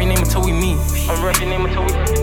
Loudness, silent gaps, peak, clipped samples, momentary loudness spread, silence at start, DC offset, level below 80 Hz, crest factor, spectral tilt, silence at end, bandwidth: -18 LUFS; none; -2 dBFS; under 0.1%; 3 LU; 0 s; under 0.1%; -20 dBFS; 14 dB; -4.5 dB/octave; 0 s; 17.5 kHz